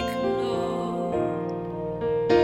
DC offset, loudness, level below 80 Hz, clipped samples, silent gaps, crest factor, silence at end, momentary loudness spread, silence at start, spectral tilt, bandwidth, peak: under 0.1%; -27 LUFS; -50 dBFS; under 0.1%; none; 18 dB; 0 s; 5 LU; 0 s; -7 dB/octave; 16 kHz; -8 dBFS